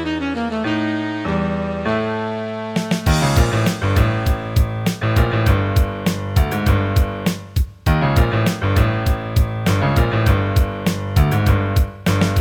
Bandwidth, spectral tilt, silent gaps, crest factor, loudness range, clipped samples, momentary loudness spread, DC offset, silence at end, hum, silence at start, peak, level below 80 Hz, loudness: 19 kHz; -6.5 dB/octave; none; 16 dB; 2 LU; under 0.1%; 6 LU; 0.4%; 0 s; none; 0 s; 0 dBFS; -24 dBFS; -19 LUFS